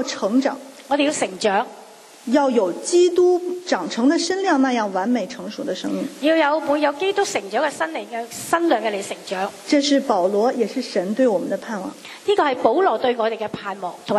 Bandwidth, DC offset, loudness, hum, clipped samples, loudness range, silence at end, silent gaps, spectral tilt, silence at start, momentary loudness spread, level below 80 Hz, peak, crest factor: 13.5 kHz; under 0.1%; -20 LUFS; none; under 0.1%; 2 LU; 0 s; none; -3.5 dB/octave; 0 s; 11 LU; -70 dBFS; -2 dBFS; 18 dB